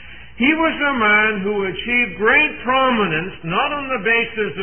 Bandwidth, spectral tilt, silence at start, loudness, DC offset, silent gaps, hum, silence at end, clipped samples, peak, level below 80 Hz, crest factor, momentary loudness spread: 3.4 kHz; -10 dB/octave; 0 s; -17 LUFS; 1%; none; none; 0 s; under 0.1%; -2 dBFS; -46 dBFS; 16 dB; 8 LU